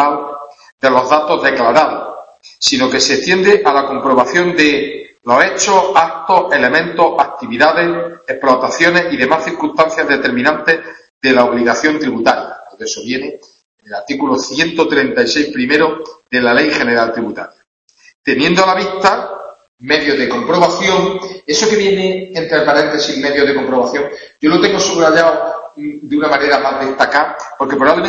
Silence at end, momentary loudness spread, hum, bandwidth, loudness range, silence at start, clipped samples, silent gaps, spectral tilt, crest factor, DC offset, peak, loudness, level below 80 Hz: 0 s; 11 LU; none; 8.4 kHz; 3 LU; 0 s; under 0.1%; 0.72-0.78 s, 11.10-11.21 s, 13.65-13.78 s, 17.67-17.88 s, 18.15-18.24 s, 19.68-19.78 s; -3.5 dB/octave; 14 dB; under 0.1%; 0 dBFS; -13 LUFS; -52 dBFS